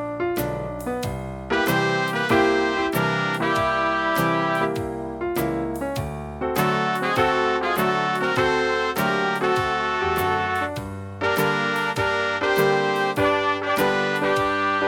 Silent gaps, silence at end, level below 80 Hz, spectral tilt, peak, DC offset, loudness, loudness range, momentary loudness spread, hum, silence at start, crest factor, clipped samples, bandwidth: none; 0 s; -46 dBFS; -5 dB/octave; -4 dBFS; under 0.1%; -22 LUFS; 2 LU; 8 LU; none; 0 s; 18 dB; under 0.1%; 18.5 kHz